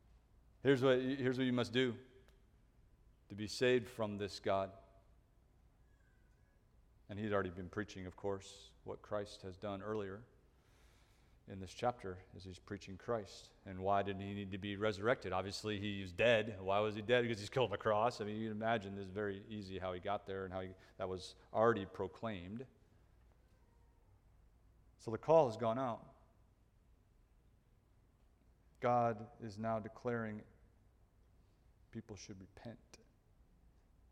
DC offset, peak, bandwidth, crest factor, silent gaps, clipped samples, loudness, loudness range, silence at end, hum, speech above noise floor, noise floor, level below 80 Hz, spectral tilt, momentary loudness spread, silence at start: under 0.1%; -18 dBFS; 14.5 kHz; 22 dB; none; under 0.1%; -39 LUFS; 11 LU; 1.15 s; none; 31 dB; -70 dBFS; -68 dBFS; -6 dB/octave; 18 LU; 0.65 s